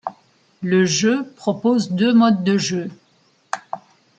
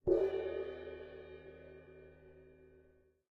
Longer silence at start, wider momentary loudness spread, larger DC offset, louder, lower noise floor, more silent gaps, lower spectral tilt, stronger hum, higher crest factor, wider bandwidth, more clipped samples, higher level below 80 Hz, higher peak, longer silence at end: about the same, 0.05 s vs 0.05 s; second, 18 LU vs 26 LU; neither; first, -18 LUFS vs -40 LUFS; second, -59 dBFS vs -68 dBFS; neither; second, -5 dB/octave vs -8.5 dB/octave; neither; second, 16 dB vs 22 dB; first, 9 kHz vs 5 kHz; neither; about the same, -66 dBFS vs -62 dBFS; first, -4 dBFS vs -20 dBFS; second, 0.4 s vs 0.65 s